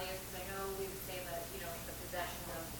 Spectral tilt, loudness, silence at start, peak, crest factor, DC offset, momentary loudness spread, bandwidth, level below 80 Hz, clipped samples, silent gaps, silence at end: -3 dB/octave; -43 LUFS; 0 s; -26 dBFS; 16 dB; under 0.1%; 2 LU; 19 kHz; -56 dBFS; under 0.1%; none; 0 s